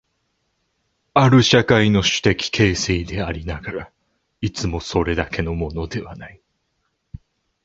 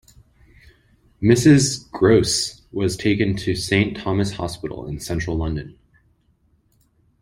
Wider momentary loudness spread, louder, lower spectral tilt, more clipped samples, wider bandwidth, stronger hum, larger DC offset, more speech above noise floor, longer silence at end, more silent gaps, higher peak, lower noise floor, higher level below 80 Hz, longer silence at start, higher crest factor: about the same, 15 LU vs 14 LU; about the same, -19 LUFS vs -20 LUFS; about the same, -5 dB/octave vs -5 dB/octave; neither; second, 8 kHz vs 16.5 kHz; neither; neither; first, 52 dB vs 43 dB; second, 1.35 s vs 1.5 s; neither; about the same, 0 dBFS vs -2 dBFS; first, -71 dBFS vs -62 dBFS; first, -36 dBFS vs -42 dBFS; about the same, 1.15 s vs 1.2 s; about the same, 20 dB vs 20 dB